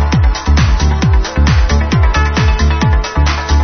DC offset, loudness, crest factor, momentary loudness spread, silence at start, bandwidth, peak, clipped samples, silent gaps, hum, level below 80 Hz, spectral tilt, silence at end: under 0.1%; -12 LUFS; 10 dB; 2 LU; 0 s; 6.6 kHz; 0 dBFS; under 0.1%; none; none; -12 dBFS; -5.5 dB/octave; 0 s